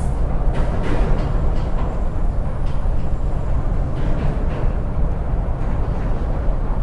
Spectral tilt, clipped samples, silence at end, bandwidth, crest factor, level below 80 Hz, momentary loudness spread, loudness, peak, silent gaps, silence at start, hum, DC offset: -8.5 dB/octave; under 0.1%; 0 s; 5.2 kHz; 12 dB; -20 dBFS; 3 LU; -24 LUFS; -4 dBFS; none; 0 s; none; under 0.1%